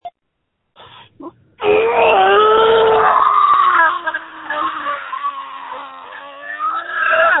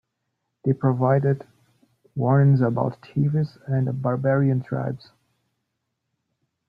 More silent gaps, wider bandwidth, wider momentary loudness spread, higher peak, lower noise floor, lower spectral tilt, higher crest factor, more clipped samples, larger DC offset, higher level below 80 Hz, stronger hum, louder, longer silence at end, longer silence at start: neither; second, 4.1 kHz vs 5 kHz; first, 19 LU vs 11 LU; first, 0 dBFS vs -6 dBFS; second, -72 dBFS vs -78 dBFS; second, -7 dB/octave vs -11.5 dB/octave; about the same, 16 dB vs 16 dB; neither; neither; first, -52 dBFS vs -62 dBFS; neither; first, -14 LUFS vs -23 LUFS; second, 0 s vs 1.7 s; second, 0.05 s vs 0.65 s